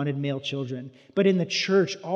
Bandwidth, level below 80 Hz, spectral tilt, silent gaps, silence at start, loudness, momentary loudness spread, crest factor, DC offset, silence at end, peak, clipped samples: 7.8 kHz; -80 dBFS; -5.5 dB/octave; none; 0 s; -25 LUFS; 11 LU; 16 dB; under 0.1%; 0 s; -8 dBFS; under 0.1%